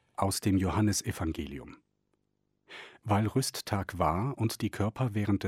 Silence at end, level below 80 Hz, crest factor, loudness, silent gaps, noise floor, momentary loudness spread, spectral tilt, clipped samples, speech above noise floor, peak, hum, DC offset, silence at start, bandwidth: 0 s; -52 dBFS; 20 dB; -31 LUFS; none; -78 dBFS; 15 LU; -5.5 dB/octave; under 0.1%; 48 dB; -12 dBFS; 50 Hz at -55 dBFS; under 0.1%; 0.2 s; 16.5 kHz